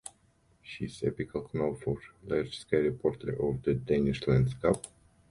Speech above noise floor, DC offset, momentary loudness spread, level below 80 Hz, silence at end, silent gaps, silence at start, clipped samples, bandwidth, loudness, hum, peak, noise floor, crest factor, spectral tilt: 36 dB; under 0.1%; 12 LU; -52 dBFS; 0.45 s; none; 0.05 s; under 0.1%; 11.5 kHz; -31 LUFS; none; -12 dBFS; -67 dBFS; 20 dB; -7 dB/octave